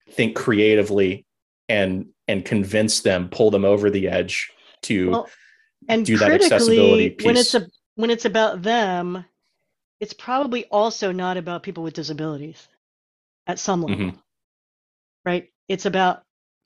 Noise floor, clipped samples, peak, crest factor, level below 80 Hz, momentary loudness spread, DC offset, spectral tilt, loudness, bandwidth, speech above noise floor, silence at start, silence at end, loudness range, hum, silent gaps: -74 dBFS; under 0.1%; -2 dBFS; 20 dB; -60 dBFS; 16 LU; under 0.1%; -4.5 dB/octave; -20 LUFS; 12.5 kHz; 55 dB; 0.15 s; 0.5 s; 11 LU; none; 1.42-1.68 s, 7.86-7.96 s, 9.84-9.99 s, 12.77-13.46 s, 14.44-15.24 s, 15.55-15.67 s